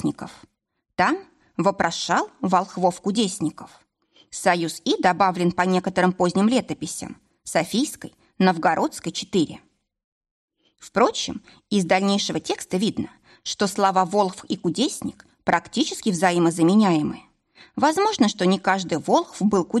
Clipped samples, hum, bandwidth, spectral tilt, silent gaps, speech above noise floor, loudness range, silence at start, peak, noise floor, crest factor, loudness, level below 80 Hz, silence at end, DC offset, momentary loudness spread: under 0.1%; none; 13 kHz; -4.5 dB/octave; 10.04-10.21 s, 10.31-10.48 s; 54 dB; 4 LU; 0 s; -6 dBFS; -76 dBFS; 18 dB; -22 LUFS; -60 dBFS; 0 s; under 0.1%; 12 LU